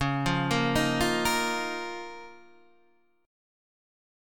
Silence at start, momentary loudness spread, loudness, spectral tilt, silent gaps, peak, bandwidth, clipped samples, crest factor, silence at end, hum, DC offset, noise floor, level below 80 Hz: 0 s; 14 LU; -27 LUFS; -4.5 dB/octave; none; -12 dBFS; 18 kHz; under 0.1%; 18 dB; 1 s; none; 0.3%; -67 dBFS; -48 dBFS